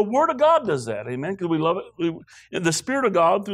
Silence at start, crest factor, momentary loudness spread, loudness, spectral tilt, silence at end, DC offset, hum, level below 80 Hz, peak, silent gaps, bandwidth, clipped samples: 0 s; 14 dB; 11 LU; -22 LUFS; -5 dB/octave; 0 s; under 0.1%; none; -64 dBFS; -8 dBFS; none; 15 kHz; under 0.1%